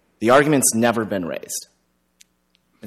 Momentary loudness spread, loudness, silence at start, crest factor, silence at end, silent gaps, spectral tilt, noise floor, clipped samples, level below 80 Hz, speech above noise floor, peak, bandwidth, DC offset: 14 LU; -18 LUFS; 0.2 s; 18 dB; 0 s; none; -4 dB/octave; -66 dBFS; under 0.1%; -62 dBFS; 48 dB; -4 dBFS; 15.5 kHz; under 0.1%